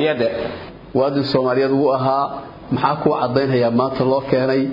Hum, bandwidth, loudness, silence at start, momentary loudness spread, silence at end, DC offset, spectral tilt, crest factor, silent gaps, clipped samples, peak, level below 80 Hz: none; 5.4 kHz; -18 LUFS; 0 s; 9 LU; 0 s; under 0.1%; -9 dB/octave; 16 dB; none; under 0.1%; -2 dBFS; -50 dBFS